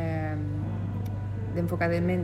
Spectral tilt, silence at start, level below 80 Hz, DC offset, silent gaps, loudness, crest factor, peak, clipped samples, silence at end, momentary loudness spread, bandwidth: -9 dB/octave; 0 s; -46 dBFS; under 0.1%; none; -30 LUFS; 16 dB; -12 dBFS; under 0.1%; 0 s; 7 LU; 12.5 kHz